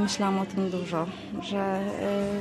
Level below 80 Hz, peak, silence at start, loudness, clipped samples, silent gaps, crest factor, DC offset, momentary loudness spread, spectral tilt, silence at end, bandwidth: -58 dBFS; -14 dBFS; 0 s; -29 LUFS; under 0.1%; none; 14 dB; under 0.1%; 5 LU; -5.5 dB/octave; 0 s; 12.5 kHz